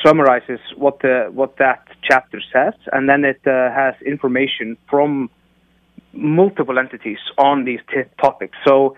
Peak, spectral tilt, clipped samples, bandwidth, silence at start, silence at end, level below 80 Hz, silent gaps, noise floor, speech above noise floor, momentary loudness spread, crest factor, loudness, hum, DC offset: 0 dBFS; -6.5 dB/octave; under 0.1%; 9.8 kHz; 0 s; 0.05 s; -60 dBFS; none; -57 dBFS; 41 dB; 9 LU; 16 dB; -17 LUFS; none; under 0.1%